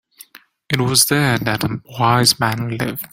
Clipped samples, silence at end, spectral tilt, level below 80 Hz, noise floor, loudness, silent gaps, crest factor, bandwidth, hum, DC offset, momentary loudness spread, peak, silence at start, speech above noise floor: under 0.1%; 0.05 s; -3.5 dB/octave; -50 dBFS; -45 dBFS; -16 LUFS; none; 18 dB; 17 kHz; none; under 0.1%; 10 LU; 0 dBFS; 0.7 s; 28 dB